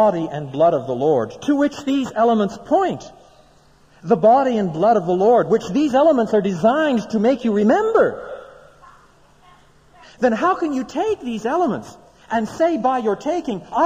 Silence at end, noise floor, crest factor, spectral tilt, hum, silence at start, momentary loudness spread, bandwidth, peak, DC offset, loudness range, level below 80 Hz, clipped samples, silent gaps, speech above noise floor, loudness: 0 s; -52 dBFS; 14 dB; -6.5 dB/octave; none; 0 s; 9 LU; 9.8 kHz; -4 dBFS; under 0.1%; 6 LU; -54 dBFS; under 0.1%; none; 34 dB; -18 LUFS